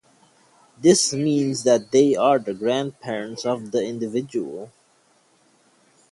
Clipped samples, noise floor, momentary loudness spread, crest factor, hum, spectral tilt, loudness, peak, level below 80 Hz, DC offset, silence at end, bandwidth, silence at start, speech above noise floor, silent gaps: under 0.1%; -60 dBFS; 12 LU; 20 dB; none; -4.5 dB/octave; -21 LUFS; -4 dBFS; -66 dBFS; under 0.1%; 1.45 s; 11.5 kHz; 0.8 s; 40 dB; none